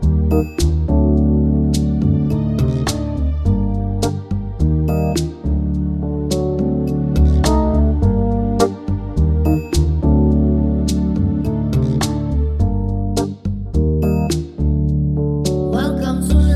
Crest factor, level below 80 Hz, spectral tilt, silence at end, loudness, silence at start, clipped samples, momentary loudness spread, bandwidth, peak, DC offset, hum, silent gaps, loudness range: 14 dB; -20 dBFS; -7.5 dB/octave; 0 s; -18 LUFS; 0 s; under 0.1%; 6 LU; 13.5 kHz; -2 dBFS; under 0.1%; none; none; 3 LU